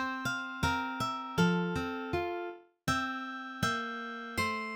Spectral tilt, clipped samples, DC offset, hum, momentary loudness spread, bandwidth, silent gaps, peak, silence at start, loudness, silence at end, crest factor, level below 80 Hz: -5 dB/octave; under 0.1%; under 0.1%; none; 9 LU; 19.5 kHz; none; -16 dBFS; 0 s; -34 LUFS; 0 s; 18 dB; -56 dBFS